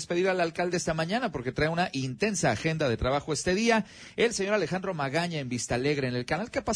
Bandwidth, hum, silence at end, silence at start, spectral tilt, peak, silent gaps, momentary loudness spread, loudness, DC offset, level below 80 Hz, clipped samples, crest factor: 10.5 kHz; none; 0 s; 0 s; -4.5 dB/octave; -12 dBFS; none; 5 LU; -28 LUFS; under 0.1%; -50 dBFS; under 0.1%; 16 dB